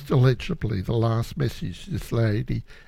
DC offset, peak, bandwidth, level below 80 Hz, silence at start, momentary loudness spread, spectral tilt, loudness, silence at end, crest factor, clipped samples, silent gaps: under 0.1%; -8 dBFS; 14.5 kHz; -40 dBFS; 0 s; 11 LU; -7.5 dB/octave; -25 LUFS; 0.05 s; 16 dB; under 0.1%; none